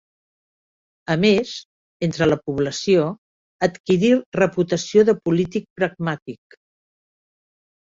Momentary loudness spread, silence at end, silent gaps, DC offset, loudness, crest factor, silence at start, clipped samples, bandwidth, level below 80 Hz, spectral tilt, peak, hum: 13 LU; 1.5 s; 1.65-2.00 s, 3.18-3.59 s, 3.80-3.84 s, 4.26-4.32 s, 5.70-5.76 s, 6.22-6.26 s; under 0.1%; -20 LUFS; 20 dB; 1.1 s; under 0.1%; 7.8 kHz; -54 dBFS; -6 dB/octave; -2 dBFS; none